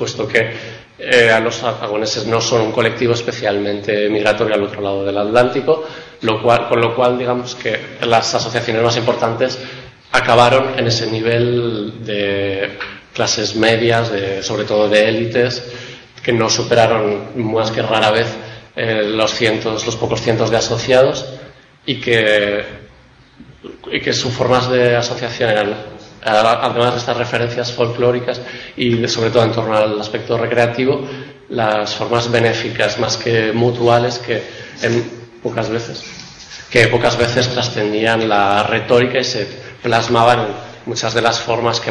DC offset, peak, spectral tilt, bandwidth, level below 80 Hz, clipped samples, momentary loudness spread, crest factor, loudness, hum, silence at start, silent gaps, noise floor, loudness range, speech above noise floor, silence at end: under 0.1%; 0 dBFS; -4.5 dB/octave; 10.5 kHz; -48 dBFS; under 0.1%; 12 LU; 16 dB; -16 LUFS; none; 0 s; none; -45 dBFS; 2 LU; 30 dB; 0 s